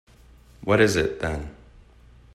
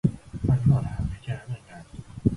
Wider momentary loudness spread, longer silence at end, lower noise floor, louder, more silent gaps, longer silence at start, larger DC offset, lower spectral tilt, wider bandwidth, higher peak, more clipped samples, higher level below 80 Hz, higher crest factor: second, 16 LU vs 21 LU; first, 0.85 s vs 0 s; first, -51 dBFS vs -43 dBFS; first, -23 LUFS vs -26 LUFS; neither; first, 0.6 s vs 0.05 s; neither; second, -5 dB/octave vs -9 dB/octave; first, 13.5 kHz vs 11 kHz; about the same, -6 dBFS vs -6 dBFS; neither; about the same, -44 dBFS vs -40 dBFS; about the same, 20 dB vs 20 dB